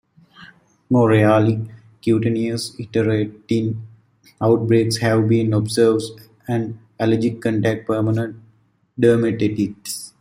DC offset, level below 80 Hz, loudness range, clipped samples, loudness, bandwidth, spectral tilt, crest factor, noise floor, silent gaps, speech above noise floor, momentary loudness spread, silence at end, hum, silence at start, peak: under 0.1%; -56 dBFS; 2 LU; under 0.1%; -19 LUFS; 16 kHz; -6.5 dB/octave; 16 dB; -58 dBFS; none; 40 dB; 12 LU; 0.15 s; none; 0.4 s; -2 dBFS